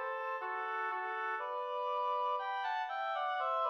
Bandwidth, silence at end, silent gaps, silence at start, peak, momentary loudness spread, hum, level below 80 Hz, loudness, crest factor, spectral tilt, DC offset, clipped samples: 7 kHz; 0 s; none; 0 s; -24 dBFS; 4 LU; none; under -90 dBFS; -37 LUFS; 14 dB; -1 dB/octave; under 0.1%; under 0.1%